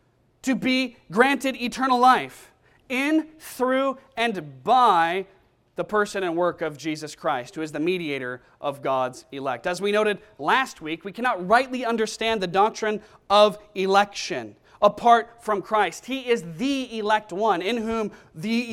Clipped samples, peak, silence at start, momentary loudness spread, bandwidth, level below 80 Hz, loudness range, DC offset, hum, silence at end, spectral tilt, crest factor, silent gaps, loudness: under 0.1%; -4 dBFS; 0.45 s; 13 LU; 16.5 kHz; -60 dBFS; 5 LU; under 0.1%; none; 0 s; -4 dB/octave; 20 dB; none; -23 LUFS